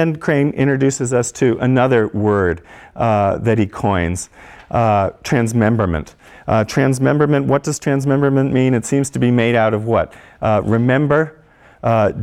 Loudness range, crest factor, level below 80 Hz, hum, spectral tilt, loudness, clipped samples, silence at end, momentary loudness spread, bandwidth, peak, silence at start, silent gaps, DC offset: 2 LU; 14 dB; -42 dBFS; none; -6.5 dB/octave; -16 LUFS; under 0.1%; 0 s; 7 LU; 14 kHz; -2 dBFS; 0 s; none; under 0.1%